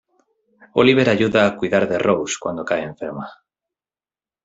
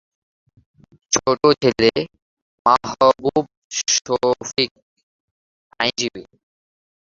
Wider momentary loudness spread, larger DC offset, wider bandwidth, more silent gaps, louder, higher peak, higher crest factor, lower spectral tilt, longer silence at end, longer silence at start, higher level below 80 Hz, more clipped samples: first, 15 LU vs 9 LU; neither; about the same, 8 kHz vs 7.8 kHz; second, none vs 2.22-2.65 s, 3.57-3.70 s, 4.71-4.75 s, 4.82-4.96 s, 5.03-5.70 s; about the same, -18 LUFS vs -19 LUFS; about the same, -2 dBFS vs 0 dBFS; about the same, 18 dB vs 20 dB; first, -5 dB/octave vs -3 dB/octave; first, 1.1 s vs 0.8 s; second, 0.75 s vs 1.1 s; about the same, -58 dBFS vs -54 dBFS; neither